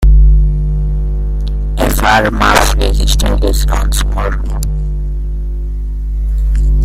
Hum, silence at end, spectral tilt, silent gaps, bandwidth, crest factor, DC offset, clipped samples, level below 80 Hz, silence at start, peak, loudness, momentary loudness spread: 50 Hz at -15 dBFS; 0 s; -4.5 dB/octave; none; 15.5 kHz; 10 dB; under 0.1%; under 0.1%; -12 dBFS; 0 s; 0 dBFS; -14 LUFS; 11 LU